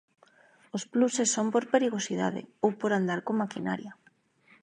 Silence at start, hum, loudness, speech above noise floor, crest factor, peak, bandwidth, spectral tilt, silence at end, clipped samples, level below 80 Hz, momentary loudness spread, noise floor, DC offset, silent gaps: 0.75 s; none; -29 LUFS; 37 dB; 20 dB; -10 dBFS; 10.5 kHz; -4.5 dB/octave; 0.7 s; under 0.1%; -78 dBFS; 10 LU; -65 dBFS; under 0.1%; none